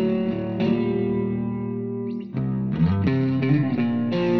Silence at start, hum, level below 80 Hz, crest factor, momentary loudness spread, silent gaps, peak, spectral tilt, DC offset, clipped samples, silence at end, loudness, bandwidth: 0 s; none; -48 dBFS; 14 dB; 7 LU; none; -8 dBFS; -10 dB/octave; under 0.1%; under 0.1%; 0 s; -24 LUFS; 6 kHz